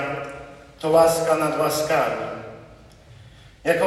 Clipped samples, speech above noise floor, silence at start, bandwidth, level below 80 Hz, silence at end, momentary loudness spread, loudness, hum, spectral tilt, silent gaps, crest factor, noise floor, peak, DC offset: under 0.1%; 27 dB; 0 s; 15.5 kHz; -54 dBFS; 0 s; 20 LU; -21 LUFS; none; -4 dB/octave; none; 18 dB; -47 dBFS; -4 dBFS; under 0.1%